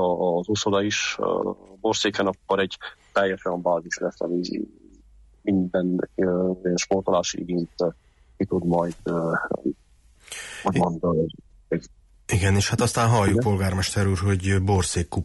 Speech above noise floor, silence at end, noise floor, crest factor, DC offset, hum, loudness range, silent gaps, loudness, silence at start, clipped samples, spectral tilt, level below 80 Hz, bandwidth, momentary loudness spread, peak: 29 dB; 0 s; -53 dBFS; 14 dB; under 0.1%; none; 4 LU; none; -24 LUFS; 0 s; under 0.1%; -5 dB/octave; -48 dBFS; 11.5 kHz; 9 LU; -10 dBFS